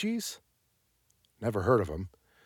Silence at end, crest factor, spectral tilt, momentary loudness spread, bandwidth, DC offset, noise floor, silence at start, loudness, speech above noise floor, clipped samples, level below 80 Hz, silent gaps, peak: 0.35 s; 22 dB; -5.5 dB/octave; 17 LU; 19 kHz; under 0.1%; -74 dBFS; 0 s; -31 LUFS; 44 dB; under 0.1%; -54 dBFS; none; -12 dBFS